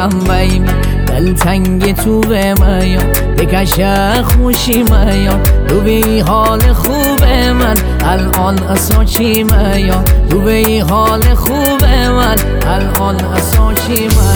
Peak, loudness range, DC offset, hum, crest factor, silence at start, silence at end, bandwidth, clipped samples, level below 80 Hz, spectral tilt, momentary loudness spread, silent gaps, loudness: 0 dBFS; 1 LU; under 0.1%; none; 10 dB; 0 s; 0 s; over 20 kHz; under 0.1%; -14 dBFS; -5.5 dB/octave; 3 LU; none; -11 LUFS